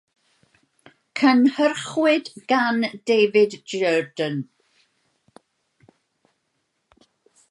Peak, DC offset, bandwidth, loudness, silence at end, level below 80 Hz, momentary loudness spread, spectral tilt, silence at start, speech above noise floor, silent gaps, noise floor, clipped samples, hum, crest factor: -4 dBFS; under 0.1%; 11.5 kHz; -20 LUFS; 3.05 s; -76 dBFS; 10 LU; -5 dB/octave; 1.15 s; 54 dB; none; -73 dBFS; under 0.1%; none; 18 dB